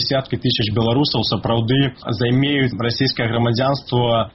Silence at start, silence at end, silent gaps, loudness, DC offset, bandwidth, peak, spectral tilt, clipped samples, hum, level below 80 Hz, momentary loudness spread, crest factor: 0 s; 0.05 s; none; -18 LUFS; under 0.1%; 6 kHz; -4 dBFS; -4.5 dB/octave; under 0.1%; none; -44 dBFS; 3 LU; 14 dB